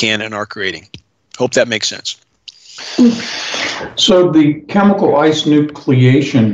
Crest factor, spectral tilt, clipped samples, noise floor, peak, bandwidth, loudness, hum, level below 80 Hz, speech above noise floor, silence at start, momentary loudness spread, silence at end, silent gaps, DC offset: 12 dB; -5 dB/octave; under 0.1%; -39 dBFS; 0 dBFS; 8.2 kHz; -13 LUFS; none; -52 dBFS; 27 dB; 0 s; 12 LU; 0 s; none; under 0.1%